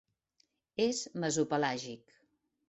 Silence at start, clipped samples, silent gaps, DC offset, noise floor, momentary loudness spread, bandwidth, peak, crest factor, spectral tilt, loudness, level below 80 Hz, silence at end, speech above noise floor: 0.8 s; under 0.1%; none; under 0.1%; -76 dBFS; 14 LU; 8.2 kHz; -18 dBFS; 18 dB; -4 dB/octave; -34 LUFS; -76 dBFS; 0.75 s; 42 dB